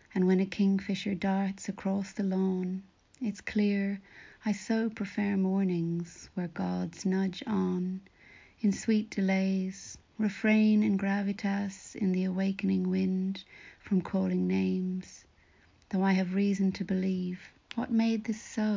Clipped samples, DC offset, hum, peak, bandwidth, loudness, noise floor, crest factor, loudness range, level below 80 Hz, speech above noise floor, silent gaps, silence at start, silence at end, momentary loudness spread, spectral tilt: under 0.1%; under 0.1%; none; -16 dBFS; 7.6 kHz; -31 LUFS; -63 dBFS; 14 dB; 3 LU; -64 dBFS; 33 dB; none; 0.15 s; 0 s; 10 LU; -7 dB/octave